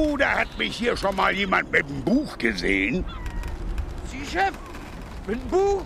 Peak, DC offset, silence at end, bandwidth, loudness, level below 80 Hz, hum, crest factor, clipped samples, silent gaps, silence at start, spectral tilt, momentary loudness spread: -6 dBFS; under 0.1%; 0 s; 15 kHz; -24 LUFS; -36 dBFS; none; 20 dB; under 0.1%; none; 0 s; -5 dB/octave; 13 LU